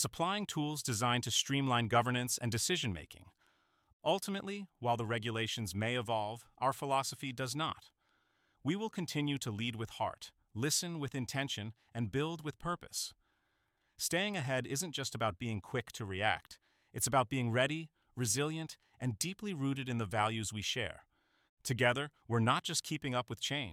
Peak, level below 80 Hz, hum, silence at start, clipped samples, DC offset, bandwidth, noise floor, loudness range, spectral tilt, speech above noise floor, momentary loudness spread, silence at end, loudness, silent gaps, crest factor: -16 dBFS; -68 dBFS; none; 0 s; under 0.1%; under 0.1%; 17 kHz; -79 dBFS; 4 LU; -4 dB/octave; 43 dB; 10 LU; 0 s; -36 LUFS; 3.93-4.00 s, 21.49-21.57 s; 22 dB